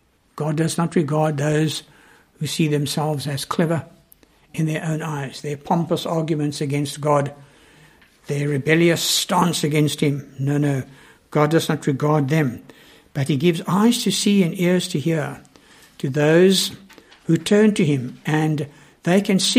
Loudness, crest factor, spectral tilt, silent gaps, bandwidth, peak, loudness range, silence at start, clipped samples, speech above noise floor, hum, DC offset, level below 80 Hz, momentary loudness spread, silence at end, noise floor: -20 LUFS; 20 dB; -5 dB/octave; none; 15.5 kHz; -2 dBFS; 5 LU; 0.35 s; under 0.1%; 35 dB; none; under 0.1%; -60 dBFS; 12 LU; 0 s; -54 dBFS